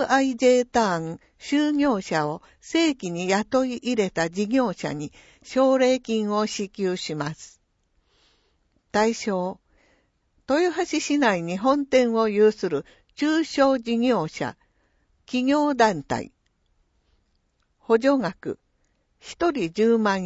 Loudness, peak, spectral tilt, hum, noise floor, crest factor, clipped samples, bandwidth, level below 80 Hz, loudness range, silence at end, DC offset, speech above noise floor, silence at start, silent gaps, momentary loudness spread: -23 LUFS; -6 dBFS; -5 dB/octave; none; -69 dBFS; 18 dB; under 0.1%; 8 kHz; -60 dBFS; 6 LU; 0 s; under 0.1%; 46 dB; 0 s; none; 11 LU